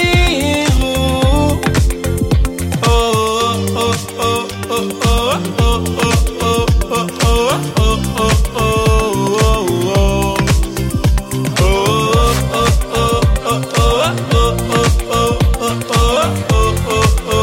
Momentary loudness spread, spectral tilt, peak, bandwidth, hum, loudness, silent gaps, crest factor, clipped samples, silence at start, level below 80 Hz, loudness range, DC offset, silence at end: 4 LU; -5 dB/octave; 0 dBFS; 17 kHz; none; -14 LUFS; none; 12 dB; under 0.1%; 0 s; -18 dBFS; 2 LU; under 0.1%; 0 s